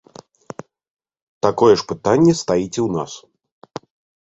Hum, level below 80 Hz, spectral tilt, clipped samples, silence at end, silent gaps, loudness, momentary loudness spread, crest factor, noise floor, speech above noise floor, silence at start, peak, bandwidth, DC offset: none; -52 dBFS; -6 dB/octave; under 0.1%; 1.05 s; none; -17 LUFS; 22 LU; 20 dB; -39 dBFS; 22 dB; 1.45 s; 0 dBFS; 8 kHz; under 0.1%